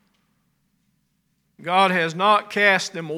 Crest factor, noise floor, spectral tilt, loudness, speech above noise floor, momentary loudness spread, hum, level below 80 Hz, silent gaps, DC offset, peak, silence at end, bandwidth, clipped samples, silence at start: 20 dB; -69 dBFS; -3.5 dB/octave; -19 LUFS; 50 dB; 5 LU; none; -78 dBFS; none; under 0.1%; -4 dBFS; 0 s; 16 kHz; under 0.1%; 1.6 s